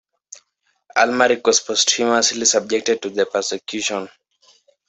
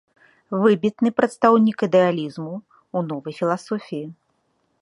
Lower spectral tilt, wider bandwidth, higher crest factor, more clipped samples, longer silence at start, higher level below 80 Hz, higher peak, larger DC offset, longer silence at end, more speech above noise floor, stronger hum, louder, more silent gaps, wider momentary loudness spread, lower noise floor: second, -0.5 dB/octave vs -7 dB/octave; second, 8.4 kHz vs 11 kHz; about the same, 18 dB vs 20 dB; neither; first, 0.95 s vs 0.5 s; about the same, -66 dBFS vs -68 dBFS; about the same, -2 dBFS vs -2 dBFS; neither; about the same, 0.8 s vs 0.7 s; about the same, 49 dB vs 48 dB; neither; first, -18 LUFS vs -21 LUFS; neither; second, 9 LU vs 16 LU; about the same, -67 dBFS vs -68 dBFS